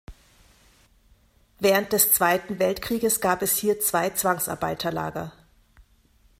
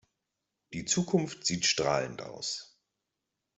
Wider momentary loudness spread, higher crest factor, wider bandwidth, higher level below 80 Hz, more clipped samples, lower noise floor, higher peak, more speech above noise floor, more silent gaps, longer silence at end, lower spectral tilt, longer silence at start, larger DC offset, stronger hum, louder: second, 10 LU vs 13 LU; about the same, 20 dB vs 22 dB; first, 16 kHz vs 8.2 kHz; first, -54 dBFS vs -66 dBFS; neither; second, -60 dBFS vs -86 dBFS; first, -6 dBFS vs -12 dBFS; second, 36 dB vs 55 dB; neither; first, 1.1 s vs 0.9 s; about the same, -3 dB/octave vs -3 dB/octave; second, 0.1 s vs 0.7 s; neither; neither; first, -23 LUFS vs -30 LUFS